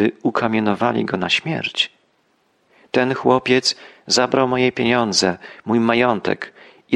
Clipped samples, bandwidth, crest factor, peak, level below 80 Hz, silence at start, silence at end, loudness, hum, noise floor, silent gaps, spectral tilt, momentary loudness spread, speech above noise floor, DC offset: under 0.1%; 12 kHz; 18 dB; -2 dBFS; -58 dBFS; 0 s; 0 s; -18 LUFS; none; -63 dBFS; none; -4 dB/octave; 7 LU; 44 dB; under 0.1%